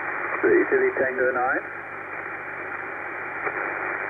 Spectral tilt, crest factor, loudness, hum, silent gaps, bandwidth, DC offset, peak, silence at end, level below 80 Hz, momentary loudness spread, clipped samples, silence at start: -8.5 dB/octave; 18 dB; -25 LUFS; 50 Hz at -60 dBFS; none; 3.7 kHz; under 0.1%; -8 dBFS; 0 s; -64 dBFS; 12 LU; under 0.1%; 0 s